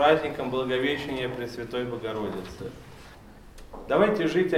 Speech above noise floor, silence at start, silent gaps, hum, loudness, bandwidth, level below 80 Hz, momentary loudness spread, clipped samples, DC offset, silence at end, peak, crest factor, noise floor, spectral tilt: 21 dB; 0 s; none; none; -27 LUFS; 16 kHz; -52 dBFS; 23 LU; under 0.1%; under 0.1%; 0 s; -6 dBFS; 20 dB; -48 dBFS; -6 dB/octave